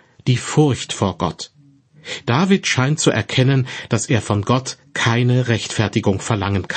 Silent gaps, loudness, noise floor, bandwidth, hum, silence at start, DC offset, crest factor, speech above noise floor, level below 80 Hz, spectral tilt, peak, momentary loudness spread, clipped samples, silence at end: none; -18 LUFS; -50 dBFS; 8.8 kHz; none; 0.25 s; under 0.1%; 16 dB; 32 dB; -50 dBFS; -5 dB/octave; -2 dBFS; 9 LU; under 0.1%; 0 s